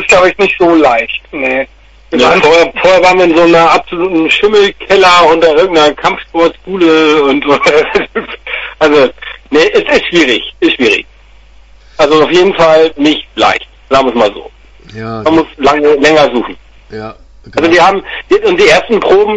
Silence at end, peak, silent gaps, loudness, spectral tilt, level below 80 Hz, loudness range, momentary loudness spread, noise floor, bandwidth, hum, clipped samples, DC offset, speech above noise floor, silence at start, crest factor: 0 s; 0 dBFS; none; -8 LUFS; -4 dB/octave; -38 dBFS; 4 LU; 12 LU; -38 dBFS; 11 kHz; none; 0.4%; under 0.1%; 30 dB; 0 s; 8 dB